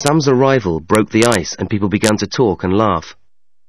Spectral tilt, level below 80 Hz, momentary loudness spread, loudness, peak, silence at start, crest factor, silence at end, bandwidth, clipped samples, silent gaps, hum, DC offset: -5 dB/octave; -44 dBFS; 6 LU; -15 LUFS; 0 dBFS; 0 s; 16 dB; 0.55 s; 11 kHz; under 0.1%; none; none; 0.7%